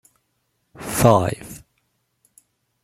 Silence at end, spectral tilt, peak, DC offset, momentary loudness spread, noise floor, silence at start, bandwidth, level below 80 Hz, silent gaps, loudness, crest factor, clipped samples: 1.25 s; -5.5 dB/octave; 0 dBFS; under 0.1%; 24 LU; -71 dBFS; 0.8 s; 16.5 kHz; -48 dBFS; none; -18 LUFS; 24 dB; under 0.1%